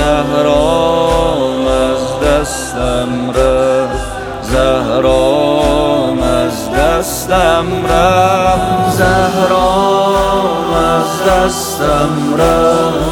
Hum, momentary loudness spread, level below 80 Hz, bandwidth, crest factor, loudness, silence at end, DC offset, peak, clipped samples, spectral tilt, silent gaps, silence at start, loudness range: none; 5 LU; -26 dBFS; 18.5 kHz; 12 dB; -12 LUFS; 0 s; under 0.1%; 0 dBFS; under 0.1%; -5 dB/octave; none; 0 s; 2 LU